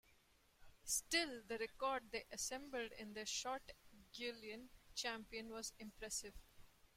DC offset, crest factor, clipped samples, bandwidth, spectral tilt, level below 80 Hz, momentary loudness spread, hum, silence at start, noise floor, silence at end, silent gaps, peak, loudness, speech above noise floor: under 0.1%; 22 dB; under 0.1%; 16.5 kHz; -1 dB/octave; -70 dBFS; 15 LU; none; 0.1 s; -74 dBFS; 0.25 s; none; -26 dBFS; -46 LUFS; 27 dB